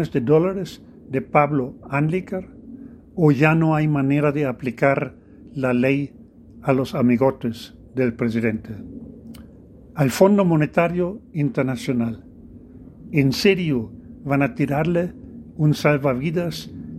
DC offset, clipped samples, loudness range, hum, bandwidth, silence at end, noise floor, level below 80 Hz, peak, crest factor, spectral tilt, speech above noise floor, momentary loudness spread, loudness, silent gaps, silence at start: under 0.1%; under 0.1%; 3 LU; none; 14.5 kHz; 0 s; -45 dBFS; -50 dBFS; 0 dBFS; 20 dB; -7 dB/octave; 25 dB; 18 LU; -21 LUFS; none; 0 s